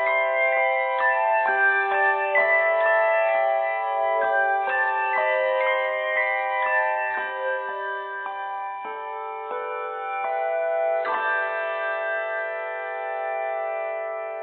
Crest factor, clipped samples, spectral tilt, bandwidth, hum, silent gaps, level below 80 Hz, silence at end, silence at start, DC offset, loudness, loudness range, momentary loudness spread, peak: 16 dB; under 0.1%; -5 dB/octave; 4.4 kHz; none; none; -78 dBFS; 0 s; 0 s; under 0.1%; -23 LUFS; 8 LU; 11 LU; -8 dBFS